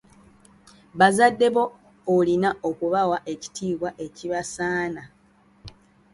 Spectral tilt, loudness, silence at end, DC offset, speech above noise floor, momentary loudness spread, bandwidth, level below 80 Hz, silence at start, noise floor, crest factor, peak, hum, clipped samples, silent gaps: -5 dB/octave; -23 LUFS; 0.45 s; under 0.1%; 31 dB; 15 LU; 11.5 kHz; -60 dBFS; 0.95 s; -53 dBFS; 22 dB; -4 dBFS; none; under 0.1%; none